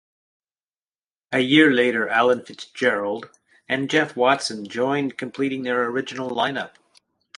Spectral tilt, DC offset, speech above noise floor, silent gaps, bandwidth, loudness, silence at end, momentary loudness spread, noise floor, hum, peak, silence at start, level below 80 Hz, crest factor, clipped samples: -4.5 dB/octave; under 0.1%; over 69 dB; none; 11 kHz; -21 LUFS; 0.7 s; 12 LU; under -90 dBFS; none; 0 dBFS; 1.3 s; -70 dBFS; 22 dB; under 0.1%